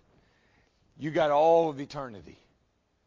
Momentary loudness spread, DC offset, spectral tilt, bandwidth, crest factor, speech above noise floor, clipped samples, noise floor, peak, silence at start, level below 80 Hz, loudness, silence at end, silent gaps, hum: 17 LU; under 0.1%; -6.5 dB/octave; 7.6 kHz; 18 dB; 46 dB; under 0.1%; -72 dBFS; -12 dBFS; 1 s; -64 dBFS; -26 LUFS; 0.75 s; none; none